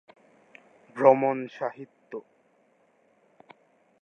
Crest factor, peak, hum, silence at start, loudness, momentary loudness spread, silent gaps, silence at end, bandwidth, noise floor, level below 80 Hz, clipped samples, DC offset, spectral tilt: 26 dB; -2 dBFS; none; 0.95 s; -24 LUFS; 23 LU; none; 1.85 s; 6.4 kHz; -65 dBFS; -88 dBFS; under 0.1%; under 0.1%; -8 dB/octave